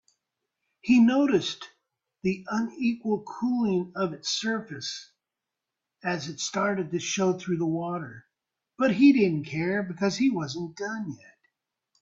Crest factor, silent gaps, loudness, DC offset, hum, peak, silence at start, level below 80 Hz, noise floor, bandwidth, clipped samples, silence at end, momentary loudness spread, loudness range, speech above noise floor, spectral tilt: 20 dB; none; -27 LUFS; under 0.1%; none; -8 dBFS; 0.85 s; -68 dBFS; -87 dBFS; 7.8 kHz; under 0.1%; 0.85 s; 15 LU; 5 LU; 61 dB; -5 dB/octave